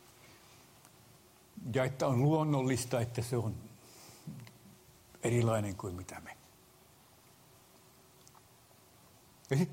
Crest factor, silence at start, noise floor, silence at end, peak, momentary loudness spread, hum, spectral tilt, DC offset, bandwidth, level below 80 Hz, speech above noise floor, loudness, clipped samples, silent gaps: 18 dB; 0.25 s; -62 dBFS; 0 s; -18 dBFS; 25 LU; none; -6.5 dB/octave; under 0.1%; 16 kHz; -68 dBFS; 30 dB; -34 LUFS; under 0.1%; none